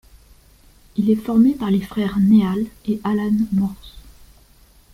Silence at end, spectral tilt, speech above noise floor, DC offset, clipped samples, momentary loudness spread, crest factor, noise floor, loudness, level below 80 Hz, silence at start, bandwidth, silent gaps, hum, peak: 0.95 s; -8.5 dB/octave; 33 dB; under 0.1%; under 0.1%; 10 LU; 16 dB; -51 dBFS; -19 LUFS; -46 dBFS; 0.95 s; 15 kHz; none; none; -4 dBFS